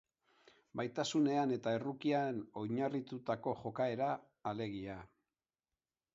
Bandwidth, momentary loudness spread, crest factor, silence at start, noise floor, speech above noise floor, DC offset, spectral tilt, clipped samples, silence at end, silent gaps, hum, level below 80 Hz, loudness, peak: 7.6 kHz; 10 LU; 18 dB; 0.75 s; under -90 dBFS; over 53 dB; under 0.1%; -5 dB/octave; under 0.1%; 1.1 s; none; none; -74 dBFS; -38 LUFS; -22 dBFS